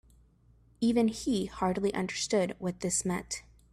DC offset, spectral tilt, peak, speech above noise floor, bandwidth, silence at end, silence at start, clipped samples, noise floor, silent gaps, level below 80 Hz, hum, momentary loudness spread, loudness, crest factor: under 0.1%; -4.5 dB/octave; -16 dBFS; 32 dB; 14 kHz; 0.3 s; 0.8 s; under 0.1%; -62 dBFS; none; -56 dBFS; none; 7 LU; -31 LUFS; 16 dB